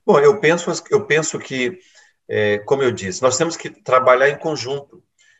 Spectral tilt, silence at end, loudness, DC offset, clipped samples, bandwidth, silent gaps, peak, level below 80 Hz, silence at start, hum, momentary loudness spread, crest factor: -4 dB/octave; 0.55 s; -18 LUFS; under 0.1%; under 0.1%; 8.6 kHz; none; -2 dBFS; -64 dBFS; 0.05 s; none; 11 LU; 18 dB